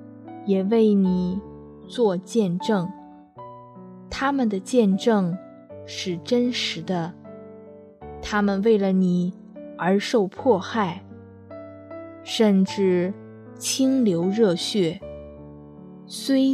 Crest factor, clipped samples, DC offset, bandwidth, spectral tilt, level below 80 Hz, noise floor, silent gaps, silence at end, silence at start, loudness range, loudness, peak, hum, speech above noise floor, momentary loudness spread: 16 dB; under 0.1%; under 0.1%; 13.5 kHz; -5.5 dB/octave; -56 dBFS; -44 dBFS; none; 0 s; 0 s; 4 LU; -23 LUFS; -6 dBFS; none; 23 dB; 23 LU